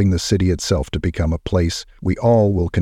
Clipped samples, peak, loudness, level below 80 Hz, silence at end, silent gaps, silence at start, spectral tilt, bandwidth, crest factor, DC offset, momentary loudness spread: under 0.1%; -2 dBFS; -19 LUFS; -32 dBFS; 0 s; none; 0 s; -6 dB/octave; 13.5 kHz; 16 dB; under 0.1%; 8 LU